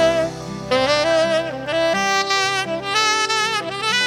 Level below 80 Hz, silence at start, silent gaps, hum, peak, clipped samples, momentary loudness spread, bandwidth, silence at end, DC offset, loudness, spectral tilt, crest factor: -50 dBFS; 0 s; none; none; -4 dBFS; under 0.1%; 5 LU; 17.5 kHz; 0 s; under 0.1%; -18 LUFS; -2.5 dB/octave; 14 dB